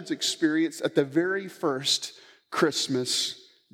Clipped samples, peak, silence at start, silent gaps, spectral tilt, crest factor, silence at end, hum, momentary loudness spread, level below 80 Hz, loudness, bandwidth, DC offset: under 0.1%; -8 dBFS; 0 s; none; -3 dB/octave; 18 dB; 0.35 s; none; 7 LU; -84 dBFS; -26 LUFS; 16.5 kHz; under 0.1%